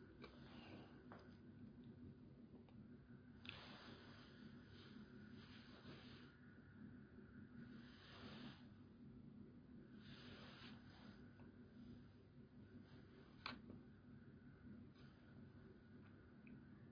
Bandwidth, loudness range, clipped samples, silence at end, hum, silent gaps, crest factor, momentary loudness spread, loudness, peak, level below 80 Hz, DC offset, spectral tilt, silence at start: 5.4 kHz; 1 LU; under 0.1%; 0 s; none; none; 28 dB; 7 LU; -62 LUFS; -34 dBFS; -76 dBFS; under 0.1%; -4.5 dB/octave; 0 s